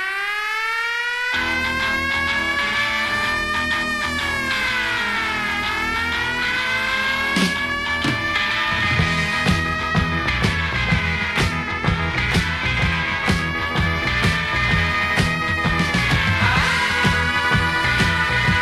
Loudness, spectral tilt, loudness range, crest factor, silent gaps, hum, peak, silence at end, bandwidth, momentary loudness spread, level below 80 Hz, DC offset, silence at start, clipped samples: -19 LUFS; -4 dB/octave; 2 LU; 16 dB; none; none; -4 dBFS; 0 s; 13 kHz; 3 LU; -32 dBFS; under 0.1%; 0 s; under 0.1%